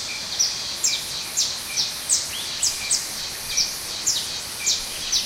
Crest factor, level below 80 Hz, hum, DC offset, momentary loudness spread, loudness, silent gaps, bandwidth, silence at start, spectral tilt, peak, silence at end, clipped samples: 20 dB; -52 dBFS; none; under 0.1%; 4 LU; -22 LUFS; none; 16 kHz; 0 s; 1.5 dB/octave; -6 dBFS; 0 s; under 0.1%